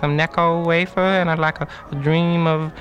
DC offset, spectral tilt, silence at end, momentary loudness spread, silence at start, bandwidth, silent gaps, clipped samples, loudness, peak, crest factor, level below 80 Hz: under 0.1%; -7.5 dB/octave; 0 s; 6 LU; 0 s; 7.4 kHz; none; under 0.1%; -19 LUFS; -4 dBFS; 16 dB; -46 dBFS